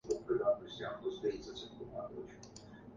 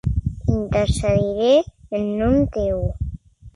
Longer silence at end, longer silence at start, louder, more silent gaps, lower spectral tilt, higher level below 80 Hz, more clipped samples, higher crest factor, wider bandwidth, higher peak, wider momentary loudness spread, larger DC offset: about the same, 0 s vs 0.05 s; about the same, 0.05 s vs 0.05 s; second, -40 LUFS vs -20 LUFS; neither; second, -5 dB/octave vs -7 dB/octave; second, -66 dBFS vs -30 dBFS; neither; about the same, 18 dB vs 14 dB; second, 9.6 kHz vs 11.5 kHz; second, -22 dBFS vs -6 dBFS; first, 18 LU vs 11 LU; neither